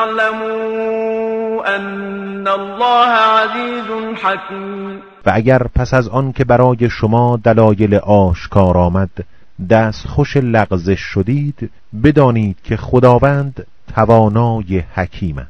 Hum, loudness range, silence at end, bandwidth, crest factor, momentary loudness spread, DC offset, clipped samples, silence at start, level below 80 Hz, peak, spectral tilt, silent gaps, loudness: none; 3 LU; 0 s; 7 kHz; 14 dB; 12 LU; under 0.1%; 0.3%; 0 s; -34 dBFS; 0 dBFS; -8 dB/octave; none; -14 LUFS